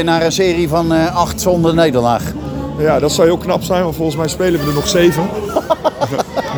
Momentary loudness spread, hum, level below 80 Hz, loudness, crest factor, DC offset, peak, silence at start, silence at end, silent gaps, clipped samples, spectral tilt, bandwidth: 7 LU; none; -34 dBFS; -14 LUFS; 14 dB; under 0.1%; 0 dBFS; 0 s; 0 s; none; under 0.1%; -5 dB/octave; over 20 kHz